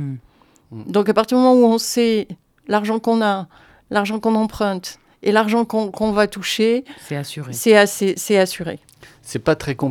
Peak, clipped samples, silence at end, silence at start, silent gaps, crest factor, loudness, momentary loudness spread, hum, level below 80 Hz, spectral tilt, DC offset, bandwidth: 0 dBFS; under 0.1%; 0 s; 0 s; none; 18 dB; -18 LUFS; 17 LU; none; -52 dBFS; -4.5 dB/octave; under 0.1%; 17.5 kHz